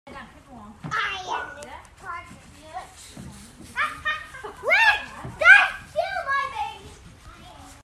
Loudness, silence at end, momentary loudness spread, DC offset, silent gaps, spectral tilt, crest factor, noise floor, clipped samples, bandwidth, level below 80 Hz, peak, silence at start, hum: -21 LUFS; 0.1 s; 27 LU; under 0.1%; none; -2.5 dB/octave; 24 dB; -46 dBFS; under 0.1%; 13.5 kHz; -54 dBFS; 0 dBFS; 0.05 s; none